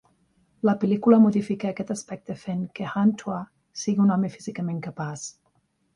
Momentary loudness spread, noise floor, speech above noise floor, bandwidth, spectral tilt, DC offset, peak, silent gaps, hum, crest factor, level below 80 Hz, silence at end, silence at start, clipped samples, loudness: 16 LU; -69 dBFS; 45 dB; 11 kHz; -7 dB/octave; under 0.1%; -6 dBFS; none; none; 20 dB; -66 dBFS; 0.65 s; 0.65 s; under 0.1%; -24 LUFS